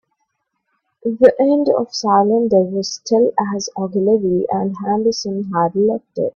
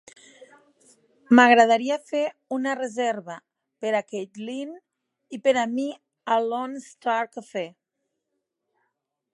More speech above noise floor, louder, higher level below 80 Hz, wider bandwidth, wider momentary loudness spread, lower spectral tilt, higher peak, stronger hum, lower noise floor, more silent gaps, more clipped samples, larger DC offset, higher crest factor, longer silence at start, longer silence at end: about the same, 55 dB vs 57 dB; first, -17 LUFS vs -23 LUFS; first, -58 dBFS vs -80 dBFS; second, 7.4 kHz vs 11.5 kHz; second, 9 LU vs 18 LU; first, -5.5 dB/octave vs -4 dB/octave; about the same, 0 dBFS vs -2 dBFS; neither; second, -71 dBFS vs -80 dBFS; neither; neither; neither; second, 16 dB vs 24 dB; second, 1.05 s vs 1.3 s; second, 0.05 s vs 1.65 s